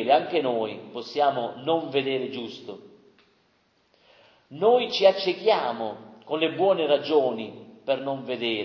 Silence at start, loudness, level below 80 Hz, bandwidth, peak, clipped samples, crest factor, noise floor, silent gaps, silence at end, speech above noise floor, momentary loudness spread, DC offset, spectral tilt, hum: 0 s; -25 LUFS; -78 dBFS; 6.6 kHz; -6 dBFS; under 0.1%; 20 dB; -66 dBFS; none; 0 s; 42 dB; 16 LU; under 0.1%; -5.5 dB/octave; none